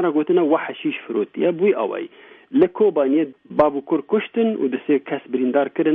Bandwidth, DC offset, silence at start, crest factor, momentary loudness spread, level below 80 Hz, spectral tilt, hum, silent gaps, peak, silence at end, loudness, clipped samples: 3.9 kHz; under 0.1%; 0 s; 16 dB; 8 LU; -62 dBFS; -9.5 dB/octave; none; none; -4 dBFS; 0 s; -20 LUFS; under 0.1%